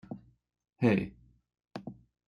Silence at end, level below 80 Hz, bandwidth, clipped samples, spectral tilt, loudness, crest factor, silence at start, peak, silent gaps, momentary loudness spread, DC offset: 0.35 s; -62 dBFS; 10.5 kHz; under 0.1%; -8.5 dB/octave; -30 LUFS; 22 dB; 0.1 s; -12 dBFS; none; 20 LU; under 0.1%